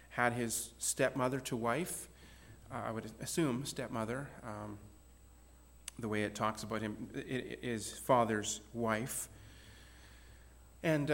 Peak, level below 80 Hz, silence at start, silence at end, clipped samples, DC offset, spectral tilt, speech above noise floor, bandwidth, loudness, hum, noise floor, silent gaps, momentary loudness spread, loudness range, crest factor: -16 dBFS; -62 dBFS; 0 s; 0 s; under 0.1%; under 0.1%; -4.5 dB/octave; 23 dB; 17 kHz; -37 LUFS; none; -60 dBFS; none; 23 LU; 5 LU; 22 dB